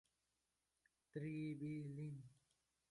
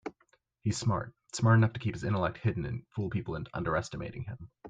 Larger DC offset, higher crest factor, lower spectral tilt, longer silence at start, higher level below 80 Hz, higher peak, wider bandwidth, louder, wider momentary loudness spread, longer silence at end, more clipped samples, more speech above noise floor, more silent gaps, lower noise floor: neither; about the same, 16 dB vs 20 dB; first, -8.5 dB/octave vs -6.5 dB/octave; first, 1.15 s vs 0.05 s; second, -84 dBFS vs -56 dBFS; second, -36 dBFS vs -12 dBFS; first, 11.5 kHz vs 9.2 kHz; second, -50 LUFS vs -32 LUFS; second, 10 LU vs 14 LU; first, 0.55 s vs 0 s; neither; about the same, 41 dB vs 40 dB; neither; first, -89 dBFS vs -70 dBFS